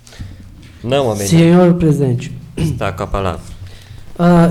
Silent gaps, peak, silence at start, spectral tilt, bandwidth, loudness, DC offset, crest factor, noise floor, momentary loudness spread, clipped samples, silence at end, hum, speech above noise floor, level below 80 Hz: none; -2 dBFS; 0.15 s; -7 dB/octave; 13 kHz; -14 LUFS; under 0.1%; 12 dB; -36 dBFS; 24 LU; under 0.1%; 0 s; none; 24 dB; -34 dBFS